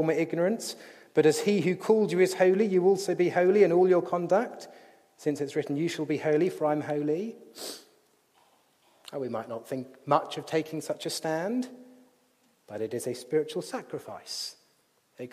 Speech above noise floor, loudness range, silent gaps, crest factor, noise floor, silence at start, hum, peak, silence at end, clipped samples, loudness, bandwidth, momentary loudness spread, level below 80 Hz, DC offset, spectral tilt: 41 dB; 11 LU; none; 20 dB; -68 dBFS; 0 s; none; -8 dBFS; 0.05 s; under 0.1%; -28 LUFS; 15 kHz; 17 LU; -80 dBFS; under 0.1%; -5.5 dB/octave